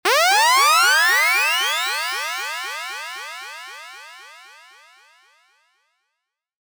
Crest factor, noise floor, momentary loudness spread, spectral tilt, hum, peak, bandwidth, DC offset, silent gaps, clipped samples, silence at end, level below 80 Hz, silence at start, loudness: 20 dB; -80 dBFS; 22 LU; 3.5 dB/octave; none; -2 dBFS; over 20 kHz; under 0.1%; none; under 0.1%; 2.3 s; -88 dBFS; 0.05 s; -17 LUFS